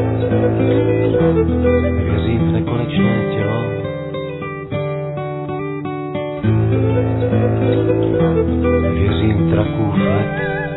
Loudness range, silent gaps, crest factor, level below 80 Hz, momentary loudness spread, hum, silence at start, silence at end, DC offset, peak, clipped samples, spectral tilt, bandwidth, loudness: 5 LU; none; 14 dB; -32 dBFS; 9 LU; none; 0 s; 0 s; under 0.1%; -2 dBFS; under 0.1%; -12 dB/octave; 4.1 kHz; -17 LUFS